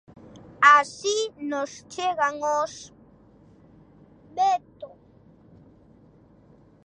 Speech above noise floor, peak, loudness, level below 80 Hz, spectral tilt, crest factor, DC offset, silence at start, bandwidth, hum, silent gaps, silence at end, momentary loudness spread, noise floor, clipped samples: 28 dB; -2 dBFS; -23 LUFS; -64 dBFS; -2 dB/octave; 24 dB; under 0.1%; 0.6 s; 10 kHz; none; none; 2 s; 25 LU; -55 dBFS; under 0.1%